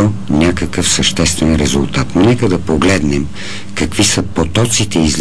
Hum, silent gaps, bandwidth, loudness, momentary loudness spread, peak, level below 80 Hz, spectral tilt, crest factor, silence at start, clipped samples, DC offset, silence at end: none; none; 11 kHz; -13 LUFS; 7 LU; -2 dBFS; -28 dBFS; -4 dB/octave; 12 dB; 0 s; under 0.1%; 6%; 0 s